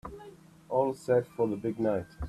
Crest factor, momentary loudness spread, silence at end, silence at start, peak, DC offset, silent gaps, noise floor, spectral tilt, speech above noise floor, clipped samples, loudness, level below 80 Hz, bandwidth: 18 dB; 10 LU; 0 s; 0.05 s; -14 dBFS; under 0.1%; none; -52 dBFS; -8 dB/octave; 22 dB; under 0.1%; -30 LUFS; -52 dBFS; 13.5 kHz